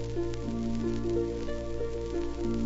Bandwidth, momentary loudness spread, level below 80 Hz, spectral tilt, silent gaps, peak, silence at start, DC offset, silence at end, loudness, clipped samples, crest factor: 8 kHz; 5 LU; -40 dBFS; -7.5 dB/octave; none; -18 dBFS; 0 s; under 0.1%; 0 s; -33 LUFS; under 0.1%; 12 dB